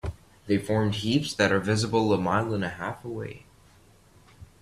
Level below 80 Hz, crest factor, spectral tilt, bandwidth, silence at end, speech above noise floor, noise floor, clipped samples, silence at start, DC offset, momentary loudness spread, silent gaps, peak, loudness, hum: -52 dBFS; 20 dB; -5.5 dB/octave; 13.5 kHz; 0.2 s; 31 dB; -56 dBFS; under 0.1%; 0.05 s; under 0.1%; 14 LU; none; -8 dBFS; -26 LUFS; none